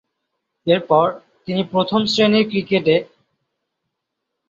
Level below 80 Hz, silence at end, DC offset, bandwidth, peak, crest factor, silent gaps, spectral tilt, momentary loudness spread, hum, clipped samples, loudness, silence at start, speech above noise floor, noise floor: -60 dBFS; 1.45 s; under 0.1%; 7.8 kHz; -2 dBFS; 18 dB; none; -6 dB/octave; 9 LU; none; under 0.1%; -18 LUFS; 0.65 s; 61 dB; -78 dBFS